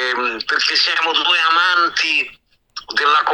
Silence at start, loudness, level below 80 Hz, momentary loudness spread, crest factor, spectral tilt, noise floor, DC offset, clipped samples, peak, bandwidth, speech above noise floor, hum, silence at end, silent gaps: 0 s; -15 LUFS; -62 dBFS; 10 LU; 14 dB; 0.5 dB/octave; -37 dBFS; under 0.1%; under 0.1%; -2 dBFS; 19 kHz; 21 dB; none; 0 s; none